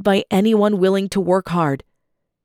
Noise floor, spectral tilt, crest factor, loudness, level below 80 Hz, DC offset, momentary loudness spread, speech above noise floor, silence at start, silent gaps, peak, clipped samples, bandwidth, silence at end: -72 dBFS; -6.5 dB/octave; 14 dB; -18 LUFS; -52 dBFS; under 0.1%; 5 LU; 55 dB; 0 s; none; -4 dBFS; under 0.1%; 15 kHz; 0.65 s